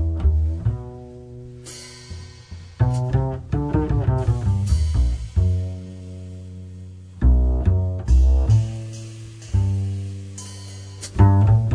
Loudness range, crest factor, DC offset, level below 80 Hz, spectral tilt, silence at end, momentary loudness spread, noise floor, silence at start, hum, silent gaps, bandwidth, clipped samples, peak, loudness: 5 LU; 20 dB; under 0.1%; -24 dBFS; -7.5 dB/octave; 0 s; 20 LU; -39 dBFS; 0 s; none; none; 10.5 kHz; under 0.1%; -2 dBFS; -21 LUFS